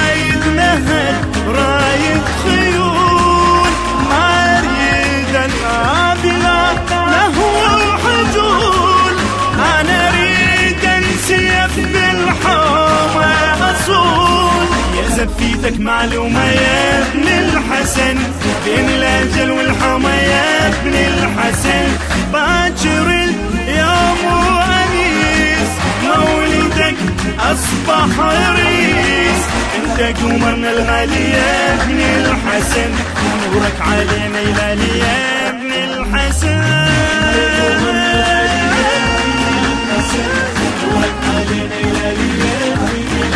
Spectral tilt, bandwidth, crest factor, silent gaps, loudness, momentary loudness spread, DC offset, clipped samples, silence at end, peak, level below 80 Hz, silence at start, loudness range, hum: -4 dB/octave; 11 kHz; 12 dB; none; -12 LUFS; 5 LU; under 0.1%; under 0.1%; 0 s; 0 dBFS; -24 dBFS; 0 s; 2 LU; none